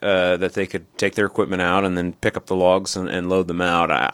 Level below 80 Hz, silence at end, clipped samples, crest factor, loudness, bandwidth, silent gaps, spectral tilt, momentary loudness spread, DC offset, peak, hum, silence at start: -52 dBFS; 0 s; under 0.1%; 18 dB; -21 LUFS; 15.5 kHz; none; -5 dB/octave; 6 LU; under 0.1%; -2 dBFS; none; 0 s